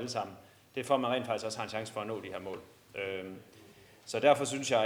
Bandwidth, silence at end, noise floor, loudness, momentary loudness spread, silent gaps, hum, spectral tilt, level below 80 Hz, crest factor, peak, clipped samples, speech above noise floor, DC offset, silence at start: over 20 kHz; 0 s; -57 dBFS; -33 LUFS; 19 LU; none; none; -4 dB/octave; -76 dBFS; 22 dB; -12 dBFS; under 0.1%; 24 dB; under 0.1%; 0 s